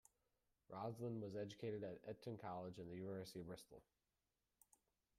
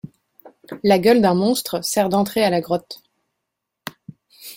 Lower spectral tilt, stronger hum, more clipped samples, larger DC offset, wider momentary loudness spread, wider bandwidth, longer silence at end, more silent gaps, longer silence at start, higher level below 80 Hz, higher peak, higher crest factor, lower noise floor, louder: first, -6.5 dB/octave vs -5 dB/octave; neither; neither; neither; second, 9 LU vs 23 LU; second, 15 kHz vs 17 kHz; first, 1.35 s vs 0 s; neither; first, 0.7 s vs 0.05 s; second, -82 dBFS vs -58 dBFS; second, -36 dBFS vs -2 dBFS; about the same, 16 dB vs 18 dB; first, under -90 dBFS vs -80 dBFS; second, -52 LUFS vs -18 LUFS